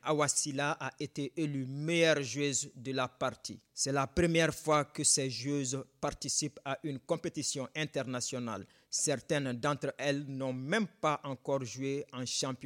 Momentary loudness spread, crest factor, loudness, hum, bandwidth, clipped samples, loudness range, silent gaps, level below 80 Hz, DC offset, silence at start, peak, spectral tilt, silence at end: 10 LU; 18 dB; -33 LUFS; none; 16.5 kHz; under 0.1%; 4 LU; none; -60 dBFS; under 0.1%; 0.05 s; -16 dBFS; -3.5 dB/octave; 0 s